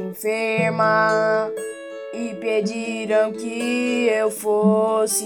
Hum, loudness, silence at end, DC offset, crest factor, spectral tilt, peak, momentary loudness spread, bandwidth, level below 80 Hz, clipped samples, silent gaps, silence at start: none; -21 LUFS; 0 s; under 0.1%; 16 dB; -4.5 dB/octave; -6 dBFS; 12 LU; 17 kHz; -80 dBFS; under 0.1%; none; 0 s